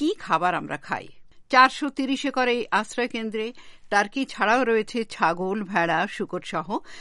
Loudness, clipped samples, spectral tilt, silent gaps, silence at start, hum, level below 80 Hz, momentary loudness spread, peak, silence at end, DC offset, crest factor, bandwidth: -24 LUFS; under 0.1%; -4 dB/octave; none; 0 s; none; -58 dBFS; 11 LU; -2 dBFS; 0 s; under 0.1%; 22 dB; 11.5 kHz